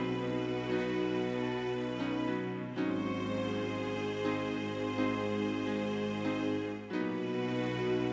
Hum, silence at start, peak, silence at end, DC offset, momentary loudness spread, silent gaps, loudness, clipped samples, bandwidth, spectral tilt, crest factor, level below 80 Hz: none; 0 s; -20 dBFS; 0 s; under 0.1%; 3 LU; none; -35 LUFS; under 0.1%; 8 kHz; -6.5 dB/octave; 14 dB; -64 dBFS